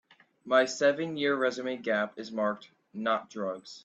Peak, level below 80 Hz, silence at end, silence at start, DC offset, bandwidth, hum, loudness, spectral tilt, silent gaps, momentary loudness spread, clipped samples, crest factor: -10 dBFS; -80 dBFS; 0.05 s; 0.45 s; under 0.1%; 8.4 kHz; none; -30 LUFS; -4 dB/octave; none; 10 LU; under 0.1%; 20 dB